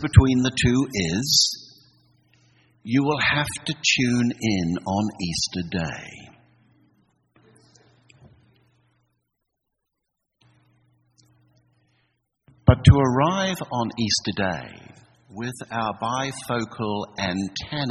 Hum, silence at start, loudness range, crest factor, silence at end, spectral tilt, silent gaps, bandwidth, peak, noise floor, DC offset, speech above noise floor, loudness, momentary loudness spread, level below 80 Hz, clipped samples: none; 0 s; 8 LU; 24 dB; 0 s; -4.5 dB/octave; none; 13 kHz; 0 dBFS; -79 dBFS; under 0.1%; 57 dB; -22 LUFS; 14 LU; -40 dBFS; under 0.1%